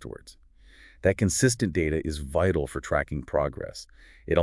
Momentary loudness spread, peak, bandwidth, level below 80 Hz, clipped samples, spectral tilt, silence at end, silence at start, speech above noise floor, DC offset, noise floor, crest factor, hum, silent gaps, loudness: 18 LU; -8 dBFS; 12 kHz; -44 dBFS; under 0.1%; -5 dB/octave; 0 s; 0 s; 26 dB; under 0.1%; -53 dBFS; 20 dB; none; none; -26 LUFS